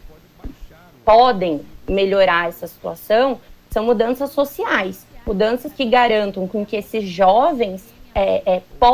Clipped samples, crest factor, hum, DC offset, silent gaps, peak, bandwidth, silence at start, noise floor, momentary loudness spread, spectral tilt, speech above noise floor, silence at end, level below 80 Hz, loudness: under 0.1%; 14 dB; none; under 0.1%; none; -4 dBFS; 16 kHz; 0.45 s; -41 dBFS; 13 LU; -5.5 dB/octave; 24 dB; 0 s; -40 dBFS; -18 LUFS